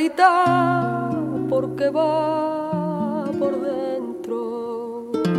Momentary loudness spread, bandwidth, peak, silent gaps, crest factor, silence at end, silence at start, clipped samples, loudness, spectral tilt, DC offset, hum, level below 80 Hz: 11 LU; 14.5 kHz; -2 dBFS; none; 18 dB; 0 s; 0 s; under 0.1%; -22 LUFS; -7 dB/octave; under 0.1%; none; -62 dBFS